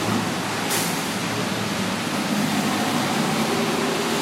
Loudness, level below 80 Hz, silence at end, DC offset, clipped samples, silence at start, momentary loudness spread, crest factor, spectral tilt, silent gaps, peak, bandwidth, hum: -23 LUFS; -58 dBFS; 0 s; under 0.1%; under 0.1%; 0 s; 3 LU; 14 dB; -3.5 dB/octave; none; -10 dBFS; 16 kHz; none